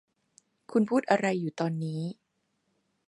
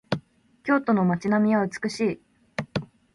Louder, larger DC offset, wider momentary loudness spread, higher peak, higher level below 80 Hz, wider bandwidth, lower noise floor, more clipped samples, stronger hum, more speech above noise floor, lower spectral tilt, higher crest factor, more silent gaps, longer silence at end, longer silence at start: second, -29 LUFS vs -25 LUFS; neither; second, 10 LU vs 14 LU; about the same, -8 dBFS vs -8 dBFS; second, -80 dBFS vs -60 dBFS; about the same, 11.5 kHz vs 11.5 kHz; first, -77 dBFS vs -51 dBFS; neither; neither; first, 49 dB vs 28 dB; about the same, -7 dB/octave vs -7 dB/octave; about the same, 22 dB vs 18 dB; neither; first, 0.95 s vs 0.3 s; first, 0.7 s vs 0.1 s